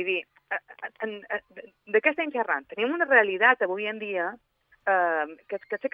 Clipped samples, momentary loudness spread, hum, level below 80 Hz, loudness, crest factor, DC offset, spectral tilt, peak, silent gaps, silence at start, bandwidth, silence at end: under 0.1%; 14 LU; none; -78 dBFS; -26 LUFS; 22 dB; under 0.1%; -6.5 dB/octave; -6 dBFS; none; 0 s; 5.2 kHz; 0.05 s